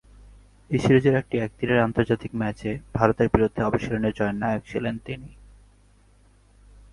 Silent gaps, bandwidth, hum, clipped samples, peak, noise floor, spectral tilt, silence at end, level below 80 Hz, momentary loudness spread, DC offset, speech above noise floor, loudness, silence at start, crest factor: none; 11.5 kHz; 50 Hz at -50 dBFS; under 0.1%; -2 dBFS; -57 dBFS; -7.5 dB/octave; 1.6 s; -44 dBFS; 11 LU; under 0.1%; 33 dB; -24 LUFS; 0.7 s; 22 dB